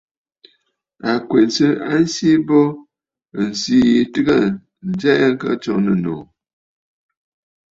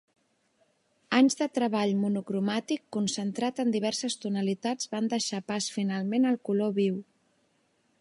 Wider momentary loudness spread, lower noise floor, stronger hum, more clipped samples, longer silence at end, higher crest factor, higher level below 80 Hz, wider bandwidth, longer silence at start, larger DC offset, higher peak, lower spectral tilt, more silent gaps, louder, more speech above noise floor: first, 12 LU vs 7 LU; second, -66 dBFS vs -71 dBFS; neither; neither; first, 1.5 s vs 1 s; about the same, 16 dB vs 20 dB; first, -56 dBFS vs -78 dBFS; second, 7.8 kHz vs 11.5 kHz; about the same, 1.05 s vs 1.1 s; neither; first, -2 dBFS vs -10 dBFS; about the same, -5.5 dB/octave vs -4.5 dB/octave; neither; first, -17 LUFS vs -29 LUFS; first, 50 dB vs 43 dB